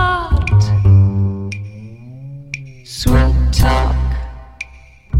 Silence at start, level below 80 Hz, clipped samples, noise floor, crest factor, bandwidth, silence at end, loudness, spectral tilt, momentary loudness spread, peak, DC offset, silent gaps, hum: 0 s; -20 dBFS; under 0.1%; -41 dBFS; 14 dB; 14.5 kHz; 0 s; -15 LUFS; -6.5 dB/octave; 21 LU; 0 dBFS; under 0.1%; none; none